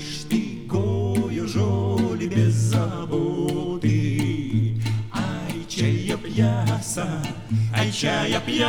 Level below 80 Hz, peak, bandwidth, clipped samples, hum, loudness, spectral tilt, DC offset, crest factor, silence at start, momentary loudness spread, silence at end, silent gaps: -46 dBFS; -8 dBFS; 14.5 kHz; under 0.1%; none; -24 LUFS; -6 dB/octave; under 0.1%; 14 dB; 0 s; 5 LU; 0 s; none